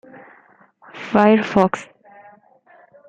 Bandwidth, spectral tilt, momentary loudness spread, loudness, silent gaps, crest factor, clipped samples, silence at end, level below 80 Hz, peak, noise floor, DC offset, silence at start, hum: 8.6 kHz; -7 dB/octave; 20 LU; -17 LUFS; none; 20 dB; under 0.1%; 1.25 s; -58 dBFS; -2 dBFS; -52 dBFS; under 0.1%; 0.95 s; none